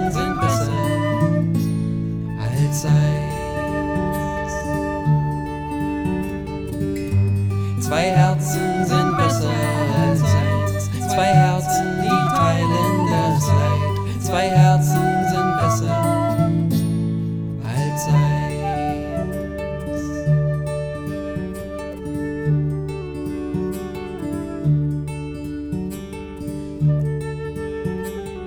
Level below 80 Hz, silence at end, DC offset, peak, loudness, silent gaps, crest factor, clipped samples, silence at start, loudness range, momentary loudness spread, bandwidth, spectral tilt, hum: -38 dBFS; 0 s; under 0.1%; -2 dBFS; -21 LUFS; none; 18 dB; under 0.1%; 0 s; 7 LU; 11 LU; 19 kHz; -6.5 dB/octave; none